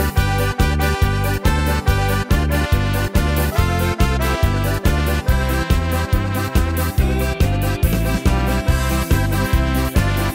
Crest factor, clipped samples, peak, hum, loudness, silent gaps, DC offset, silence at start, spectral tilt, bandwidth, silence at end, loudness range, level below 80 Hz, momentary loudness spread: 16 dB; under 0.1%; -2 dBFS; none; -18 LUFS; none; under 0.1%; 0 s; -5.5 dB/octave; 16.5 kHz; 0 s; 1 LU; -20 dBFS; 1 LU